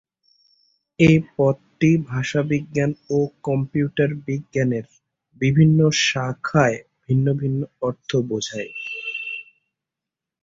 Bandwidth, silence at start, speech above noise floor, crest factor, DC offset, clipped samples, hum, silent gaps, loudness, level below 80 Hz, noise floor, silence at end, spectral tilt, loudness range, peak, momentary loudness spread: 7.6 kHz; 1 s; 67 dB; 18 dB; under 0.1%; under 0.1%; none; none; -21 LUFS; -52 dBFS; -87 dBFS; 1 s; -6 dB/octave; 5 LU; -2 dBFS; 12 LU